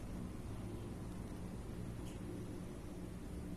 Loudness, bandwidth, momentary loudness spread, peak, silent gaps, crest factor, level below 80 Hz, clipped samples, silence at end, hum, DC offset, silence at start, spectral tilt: -48 LUFS; 13 kHz; 2 LU; -34 dBFS; none; 12 dB; -52 dBFS; under 0.1%; 0 s; none; under 0.1%; 0 s; -7 dB/octave